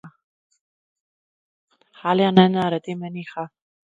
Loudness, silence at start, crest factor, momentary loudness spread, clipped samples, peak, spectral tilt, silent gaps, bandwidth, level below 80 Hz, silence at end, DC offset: -20 LUFS; 0.05 s; 24 dB; 18 LU; under 0.1%; 0 dBFS; -8 dB/octave; 0.24-0.50 s, 0.61-1.68 s; 7.4 kHz; -68 dBFS; 0.5 s; under 0.1%